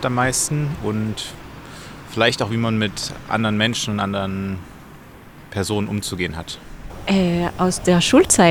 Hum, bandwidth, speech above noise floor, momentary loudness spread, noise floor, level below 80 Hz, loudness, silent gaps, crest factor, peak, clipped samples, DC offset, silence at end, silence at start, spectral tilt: none; 19.5 kHz; 22 dB; 17 LU; -42 dBFS; -42 dBFS; -20 LUFS; none; 20 dB; -2 dBFS; under 0.1%; under 0.1%; 0 s; 0 s; -4 dB/octave